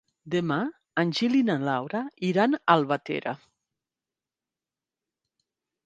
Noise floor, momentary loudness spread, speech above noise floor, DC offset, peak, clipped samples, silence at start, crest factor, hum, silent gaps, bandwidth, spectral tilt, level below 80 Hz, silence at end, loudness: under -90 dBFS; 9 LU; over 65 dB; under 0.1%; -4 dBFS; under 0.1%; 0.25 s; 24 dB; none; none; 9 kHz; -6.5 dB/octave; -74 dBFS; 2.5 s; -26 LUFS